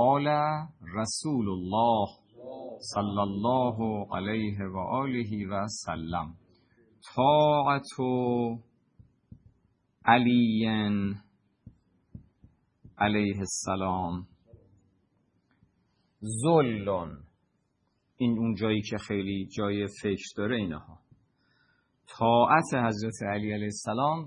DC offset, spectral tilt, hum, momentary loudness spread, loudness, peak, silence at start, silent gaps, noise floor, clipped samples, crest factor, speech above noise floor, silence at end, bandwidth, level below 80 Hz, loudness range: under 0.1%; -5.5 dB/octave; none; 12 LU; -28 LUFS; -6 dBFS; 0 s; none; -74 dBFS; under 0.1%; 24 dB; 47 dB; 0 s; 11 kHz; -62 dBFS; 5 LU